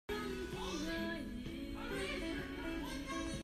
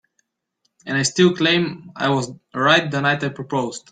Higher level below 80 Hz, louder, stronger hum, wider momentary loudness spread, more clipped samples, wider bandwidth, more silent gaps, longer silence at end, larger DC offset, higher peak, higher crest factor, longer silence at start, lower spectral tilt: first, -52 dBFS vs -60 dBFS; second, -42 LUFS vs -19 LUFS; neither; second, 5 LU vs 9 LU; neither; first, 14.5 kHz vs 9.4 kHz; neither; second, 0 s vs 0.15 s; neither; second, -28 dBFS vs -2 dBFS; about the same, 14 dB vs 18 dB; second, 0.1 s vs 0.85 s; about the same, -4.5 dB/octave vs -4 dB/octave